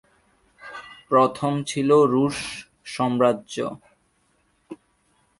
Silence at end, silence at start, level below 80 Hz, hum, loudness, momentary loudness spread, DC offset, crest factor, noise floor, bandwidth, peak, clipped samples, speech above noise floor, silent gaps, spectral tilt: 0.65 s; 0.65 s; -62 dBFS; none; -22 LUFS; 26 LU; under 0.1%; 20 dB; -66 dBFS; 11.5 kHz; -4 dBFS; under 0.1%; 45 dB; none; -5.5 dB/octave